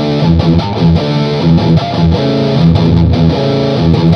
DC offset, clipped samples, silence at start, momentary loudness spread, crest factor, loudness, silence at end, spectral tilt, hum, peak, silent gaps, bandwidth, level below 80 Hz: under 0.1%; 0.4%; 0 s; 3 LU; 10 dB; -10 LUFS; 0 s; -8.5 dB/octave; none; 0 dBFS; none; 6.4 kHz; -24 dBFS